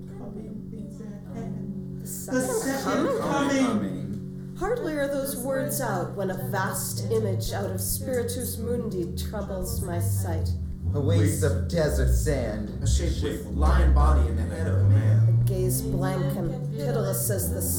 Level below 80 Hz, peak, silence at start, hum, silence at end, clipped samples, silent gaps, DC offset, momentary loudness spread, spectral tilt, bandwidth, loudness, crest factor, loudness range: -32 dBFS; -10 dBFS; 0 s; none; 0 s; under 0.1%; none; under 0.1%; 13 LU; -6 dB/octave; 19.5 kHz; -26 LUFS; 16 dB; 5 LU